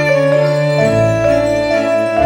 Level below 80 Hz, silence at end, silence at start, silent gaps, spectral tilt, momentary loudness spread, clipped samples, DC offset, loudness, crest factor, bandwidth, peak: -38 dBFS; 0 s; 0 s; none; -6.5 dB/octave; 2 LU; under 0.1%; under 0.1%; -13 LUFS; 10 dB; 17.5 kHz; -2 dBFS